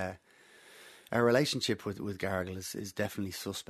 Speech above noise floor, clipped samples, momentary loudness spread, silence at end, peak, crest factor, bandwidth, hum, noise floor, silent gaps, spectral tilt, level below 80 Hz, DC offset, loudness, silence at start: 28 dB; under 0.1%; 25 LU; 0.1 s; -12 dBFS; 22 dB; 13.5 kHz; none; -60 dBFS; none; -4.5 dB/octave; -68 dBFS; under 0.1%; -33 LUFS; 0 s